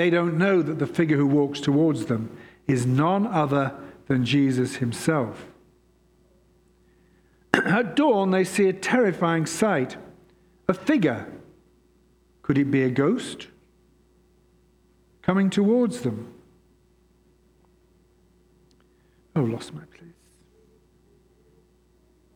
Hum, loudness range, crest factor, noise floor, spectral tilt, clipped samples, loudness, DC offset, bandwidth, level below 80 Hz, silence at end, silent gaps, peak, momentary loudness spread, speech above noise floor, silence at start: none; 12 LU; 24 dB; -61 dBFS; -6.5 dB/octave; under 0.1%; -23 LUFS; under 0.1%; 15 kHz; -60 dBFS; 2.25 s; none; 0 dBFS; 14 LU; 38 dB; 0 s